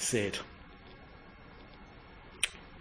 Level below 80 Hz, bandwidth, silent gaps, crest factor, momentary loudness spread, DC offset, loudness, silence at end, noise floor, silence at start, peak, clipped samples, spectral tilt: -58 dBFS; 10.5 kHz; none; 28 dB; 20 LU; under 0.1%; -35 LUFS; 0 s; -53 dBFS; 0 s; -12 dBFS; under 0.1%; -2.5 dB/octave